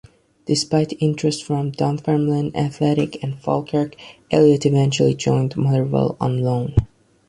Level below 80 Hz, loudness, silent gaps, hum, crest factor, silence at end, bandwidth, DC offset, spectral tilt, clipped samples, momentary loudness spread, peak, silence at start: -40 dBFS; -20 LUFS; none; none; 16 dB; 0.4 s; 11 kHz; under 0.1%; -6.5 dB/octave; under 0.1%; 7 LU; -4 dBFS; 0.45 s